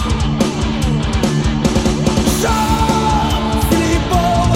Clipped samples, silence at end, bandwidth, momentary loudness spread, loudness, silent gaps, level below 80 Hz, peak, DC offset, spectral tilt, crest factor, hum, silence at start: under 0.1%; 0 s; 16.5 kHz; 3 LU; -15 LUFS; none; -22 dBFS; 0 dBFS; 0.2%; -5.5 dB/octave; 14 dB; none; 0 s